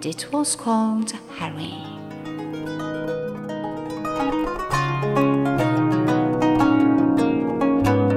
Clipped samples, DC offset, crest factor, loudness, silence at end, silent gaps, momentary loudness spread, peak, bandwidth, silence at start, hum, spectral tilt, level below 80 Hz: under 0.1%; under 0.1%; 14 dB; -22 LUFS; 0 s; none; 13 LU; -6 dBFS; 14.5 kHz; 0 s; none; -6 dB/octave; -46 dBFS